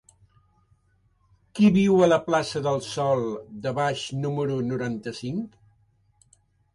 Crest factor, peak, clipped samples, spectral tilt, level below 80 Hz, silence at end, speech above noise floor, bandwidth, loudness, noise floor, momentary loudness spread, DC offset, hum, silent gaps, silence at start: 18 dB; -8 dBFS; under 0.1%; -6.5 dB/octave; -60 dBFS; 1.25 s; 42 dB; 11.5 kHz; -24 LUFS; -65 dBFS; 13 LU; under 0.1%; none; none; 1.55 s